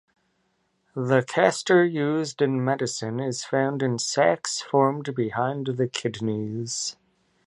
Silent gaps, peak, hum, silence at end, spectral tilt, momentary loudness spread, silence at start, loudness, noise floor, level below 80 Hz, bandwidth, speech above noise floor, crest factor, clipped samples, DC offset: none; -4 dBFS; none; 0.55 s; -4.5 dB/octave; 9 LU; 0.95 s; -24 LUFS; -71 dBFS; -68 dBFS; 11.5 kHz; 47 dB; 22 dB; under 0.1%; under 0.1%